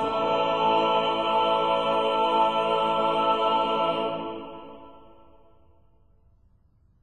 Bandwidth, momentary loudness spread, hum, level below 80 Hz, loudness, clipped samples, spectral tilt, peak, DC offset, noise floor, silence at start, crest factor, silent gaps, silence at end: 9.2 kHz; 12 LU; none; -62 dBFS; -24 LUFS; under 0.1%; -5 dB/octave; -12 dBFS; 0.3%; -62 dBFS; 0 s; 14 dB; none; 2.1 s